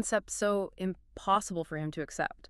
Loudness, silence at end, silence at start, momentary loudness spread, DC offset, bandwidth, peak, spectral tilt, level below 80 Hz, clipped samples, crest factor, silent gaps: -33 LUFS; 0.15 s; 0 s; 8 LU; under 0.1%; 13.5 kHz; -14 dBFS; -4 dB/octave; -58 dBFS; under 0.1%; 20 dB; none